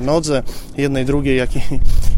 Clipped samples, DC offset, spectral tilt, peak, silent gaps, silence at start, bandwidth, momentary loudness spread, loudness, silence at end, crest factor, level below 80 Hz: under 0.1%; under 0.1%; -6 dB/octave; 0 dBFS; none; 0 s; 13 kHz; 6 LU; -19 LUFS; 0 s; 12 dB; -18 dBFS